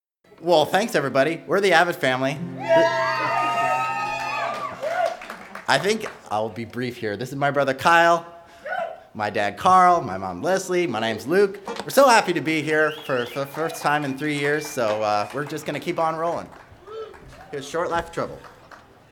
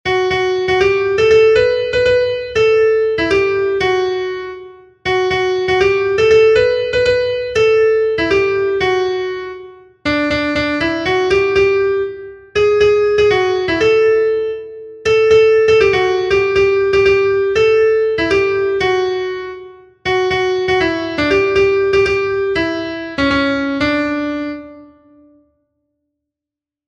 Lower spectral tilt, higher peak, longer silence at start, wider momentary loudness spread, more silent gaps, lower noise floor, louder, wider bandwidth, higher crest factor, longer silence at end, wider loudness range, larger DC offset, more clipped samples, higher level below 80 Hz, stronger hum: about the same, -4.5 dB/octave vs -5 dB/octave; about the same, 0 dBFS vs -2 dBFS; first, 0.4 s vs 0.05 s; first, 14 LU vs 11 LU; neither; second, -48 dBFS vs -86 dBFS; second, -22 LUFS vs -14 LUFS; first, 18.5 kHz vs 8.4 kHz; first, 22 dB vs 14 dB; second, 0.35 s vs 2.05 s; about the same, 6 LU vs 4 LU; neither; neither; second, -60 dBFS vs -40 dBFS; neither